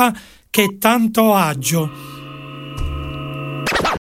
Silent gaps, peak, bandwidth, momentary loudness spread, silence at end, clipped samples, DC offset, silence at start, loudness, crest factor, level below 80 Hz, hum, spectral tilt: none; 0 dBFS; 16.5 kHz; 19 LU; 0.05 s; under 0.1%; under 0.1%; 0 s; -18 LUFS; 18 dB; -34 dBFS; none; -4.5 dB/octave